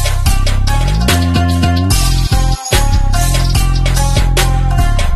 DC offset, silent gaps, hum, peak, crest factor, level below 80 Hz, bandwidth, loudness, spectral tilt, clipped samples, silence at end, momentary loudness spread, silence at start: 0.8%; none; none; 0 dBFS; 10 dB; -14 dBFS; 13 kHz; -13 LUFS; -4.5 dB/octave; under 0.1%; 0 s; 2 LU; 0 s